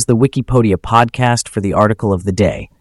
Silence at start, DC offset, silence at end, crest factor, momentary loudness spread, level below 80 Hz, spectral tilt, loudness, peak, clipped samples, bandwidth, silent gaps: 0 s; under 0.1%; 0.15 s; 14 dB; 4 LU; -34 dBFS; -6 dB/octave; -14 LUFS; 0 dBFS; under 0.1%; 12 kHz; none